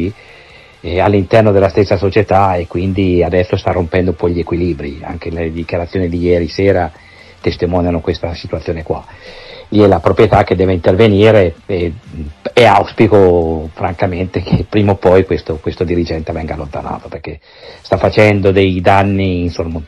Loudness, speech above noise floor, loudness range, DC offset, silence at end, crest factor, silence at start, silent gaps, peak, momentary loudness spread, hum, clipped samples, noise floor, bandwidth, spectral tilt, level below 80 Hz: -13 LUFS; 27 dB; 6 LU; under 0.1%; 0 s; 12 dB; 0 s; none; 0 dBFS; 14 LU; none; under 0.1%; -39 dBFS; 10 kHz; -8 dB/octave; -32 dBFS